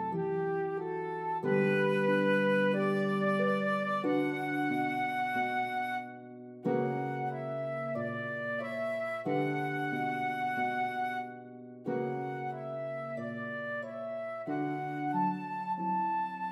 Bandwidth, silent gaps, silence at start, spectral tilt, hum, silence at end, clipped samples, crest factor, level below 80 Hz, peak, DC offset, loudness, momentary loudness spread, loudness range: 13 kHz; none; 0 s; -7.5 dB/octave; none; 0 s; under 0.1%; 16 dB; -84 dBFS; -18 dBFS; under 0.1%; -33 LUFS; 10 LU; 7 LU